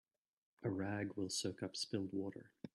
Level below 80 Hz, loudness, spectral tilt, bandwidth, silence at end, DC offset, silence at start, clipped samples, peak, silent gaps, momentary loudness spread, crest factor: -80 dBFS; -43 LUFS; -4.5 dB/octave; 12.5 kHz; 0.1 s; under 0.1%; 0.6 s; under 0.1%; -26 dBFS; none; 6 LU; 18 dB